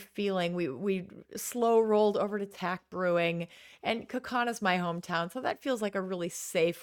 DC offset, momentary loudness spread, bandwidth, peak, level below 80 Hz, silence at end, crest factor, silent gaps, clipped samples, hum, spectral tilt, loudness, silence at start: under 0.1%; 10 LU; 19 kHz; -12 dBFS; -74 dBFS; 0 s; 18 dB; none; under 0.1%; none; -4.5 dB/octave; -31 LUFS; 0 s